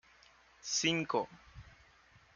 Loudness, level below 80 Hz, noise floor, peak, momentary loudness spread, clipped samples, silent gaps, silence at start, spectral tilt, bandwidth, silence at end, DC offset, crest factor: -34 LUFS; -66 dBFS; -64 dBFS; -18 dBFS; 25 LU; under 0.1%; none; 0.65 s; -2.5 dB/octave; 10 kHz; 0.65 s; under 0.1%; 22 dB